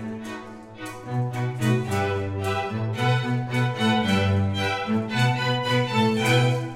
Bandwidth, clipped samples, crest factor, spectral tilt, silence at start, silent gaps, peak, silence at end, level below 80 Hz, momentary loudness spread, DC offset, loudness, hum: 15 kHz; under 0.1%; 16 dB; -6 dB/octave; 0 s; none; -8 dBFS; 0 s; -58 dBFS; 13 LU; under 0.1%; -24 LUFS; none